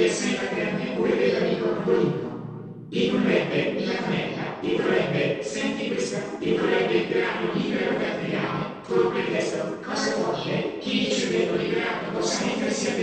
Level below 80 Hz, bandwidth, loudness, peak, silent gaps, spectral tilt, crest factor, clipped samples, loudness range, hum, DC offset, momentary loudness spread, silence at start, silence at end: -60 dBFS; 9.4 kHz; -25 LUFS; -8 dBFS; none; -5 dB/octave; 16 dB; under 0.1%; 1 LU; none; under 0.1%; 6 LU; 0 s; 0 s